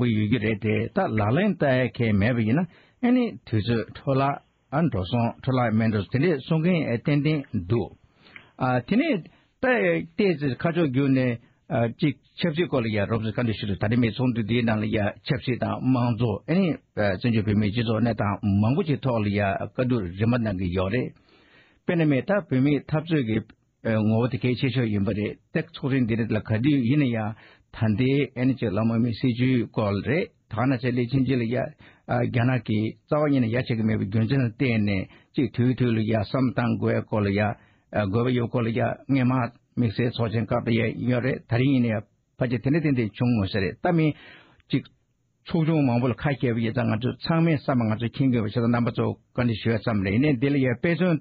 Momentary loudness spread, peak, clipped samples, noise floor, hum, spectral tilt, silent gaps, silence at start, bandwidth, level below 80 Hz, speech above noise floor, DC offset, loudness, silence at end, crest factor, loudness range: 6 LU; -10 dBFS; under 0.1%; -69 dBFS; none; -6.5 dB/octave; none; 0 s; 5 kHz; -52 dBFS; 46 dB; under 0.1%; -25 LUFS; 0 s; 14 dB; 2 LU